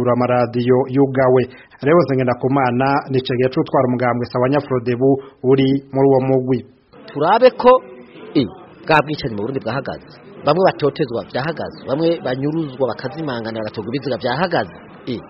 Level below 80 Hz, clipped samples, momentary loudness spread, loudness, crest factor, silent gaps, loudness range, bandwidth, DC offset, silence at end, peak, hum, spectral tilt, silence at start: -52 dBFS; under 0.1%; 11 LU; -17 LUFS; 18 dB; none; 5 LU; 5.8 kHz; under 0.1%; 0 s; 0 dBFS; none; -5.5 dB/octave; 0 s